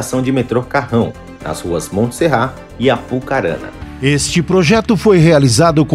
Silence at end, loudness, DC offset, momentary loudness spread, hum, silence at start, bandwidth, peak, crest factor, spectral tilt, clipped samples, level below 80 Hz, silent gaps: 0 s; -14 LUFS; under 0.1%; 12 LU; none; 0 s; 15 kHz; 0 dBFS; 14 dB; -5.5 dB/octave; under 0.1%; -36 dBFS; none